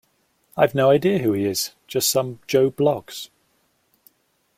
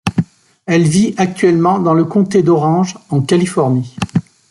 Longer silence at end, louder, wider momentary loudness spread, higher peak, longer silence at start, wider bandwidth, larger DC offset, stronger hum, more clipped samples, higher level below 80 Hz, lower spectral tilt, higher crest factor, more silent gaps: first, 1.35 s vs 0.3 s; second, -20 LUFS vs -14 LUFS; first, 18 LU vs 8 LU; about the same, -2 dBFS vs 0 dBFS; first, 0.55 s vs 0.05 s; first, 16.5 kHz vs 12 kHz; neither; neither; neither; second, -60 dBFS vs -50 dBFS; second, -4.5 dB/octave vs -6.5 dB/octave; first, 20 dB vs 12 dB; neither